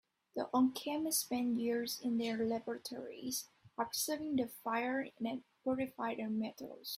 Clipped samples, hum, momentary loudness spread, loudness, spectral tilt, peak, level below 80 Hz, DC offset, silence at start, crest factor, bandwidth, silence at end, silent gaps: under 0.1%; none; 9 LU; -38 LUFS; -3 dB/octave; -20 dBFS; -78 dBFS; under 0.1%; 0.35 s; 18 dB; 16 kHz; 0 s; none